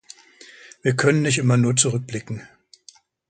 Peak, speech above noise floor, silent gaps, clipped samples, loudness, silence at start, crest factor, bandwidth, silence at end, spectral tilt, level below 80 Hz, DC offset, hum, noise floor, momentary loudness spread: -4 dBFS; 32 dB; none; under 0.1%; -20 LUFS; 0.85 s; 18 dB; 9.6 kHz; 0.85 s; -4.5 dB/octave; -60 dBFS; under 0.1%; none; -52 dBFS; 14 LU